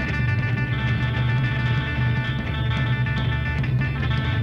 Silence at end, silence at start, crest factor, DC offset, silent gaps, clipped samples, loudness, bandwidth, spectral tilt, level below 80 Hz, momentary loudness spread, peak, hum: 0 s; 0 s; 12 dB; under 0.1%; none; under 0.1%; -23 LUFS; 6.4 kHz; -7.5 dB/octave; -32 dBFS; 2 LU; -12 dBFS; none